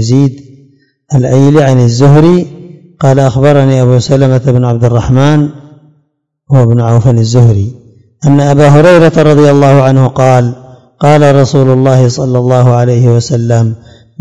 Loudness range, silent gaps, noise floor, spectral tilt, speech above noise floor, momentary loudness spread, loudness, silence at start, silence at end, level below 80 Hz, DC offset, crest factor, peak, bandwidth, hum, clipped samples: 3 LU; none; -59 dBFS; -7.5 dB/octave; 54 dB; 7 LU; -7 LUFS; 0 s; 0.45 s; -38 dBFS; 2%; 6 dB; 0 dBFS; 8.6 kHz; none; 9%